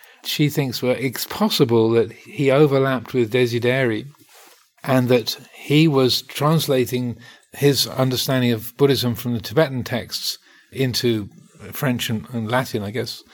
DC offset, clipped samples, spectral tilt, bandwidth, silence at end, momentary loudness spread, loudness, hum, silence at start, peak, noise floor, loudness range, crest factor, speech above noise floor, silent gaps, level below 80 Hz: under 0.1%; under 0.1%; -5.5 dB/octave; 19 kHz; 0.15 s; 10 LU; -20 LUFS; none; 0.25 s; -4 dBFS; -50 dBFS; 4 LU; 16 dB; 30 dB; none; -60 dBFS